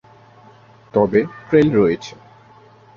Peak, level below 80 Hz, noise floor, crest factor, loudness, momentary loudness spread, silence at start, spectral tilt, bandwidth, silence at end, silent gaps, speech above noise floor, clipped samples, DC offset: -2 dBFS; -52 dBFS; -47 dBFS; 18 dB; -17 LUFS; 11 LU; 0.95 s; -7.5 dB/octave; 7 kHz; 0.85 s; none; 31 dB; under 0.1%; under 0.1%